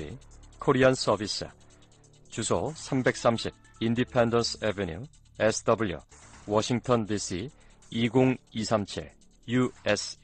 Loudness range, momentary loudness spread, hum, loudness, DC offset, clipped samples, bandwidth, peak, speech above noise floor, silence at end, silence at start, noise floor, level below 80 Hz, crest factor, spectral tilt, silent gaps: 2 LU; 17 LU; none; -28 LUFS; under 0.1%; under 0.1%; 9.4 kHz; -10 dBFS; 29 dB; 0.1 s; 0 s; -56 dBFS; -54 dBFS; 18 dB; -5 dB/octave; none